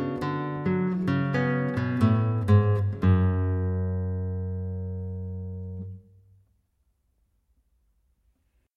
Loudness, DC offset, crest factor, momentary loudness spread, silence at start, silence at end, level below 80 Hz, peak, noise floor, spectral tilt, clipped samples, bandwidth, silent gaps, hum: -26 LUFS; under 0.1%; 18 dB; 14 LU; 0 s; 2.75 s; -52 dBFS; -8 dBFS; -71 dBFS; -9.5 dB/octave; under 0.1%; 5.6 kHz; none; none